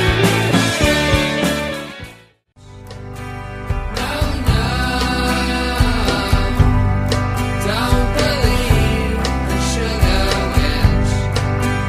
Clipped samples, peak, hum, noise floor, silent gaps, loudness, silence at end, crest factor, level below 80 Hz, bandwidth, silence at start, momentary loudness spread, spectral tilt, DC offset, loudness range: under 0.1%; 0 dBFS; none; -47 dBFS; none; -17 LUFS; 0 s; 16 dB; -22 dBFS; 15.5 kHz; 0 s; 13 LU; -5 dB/octave; under 0.1%; 5 LU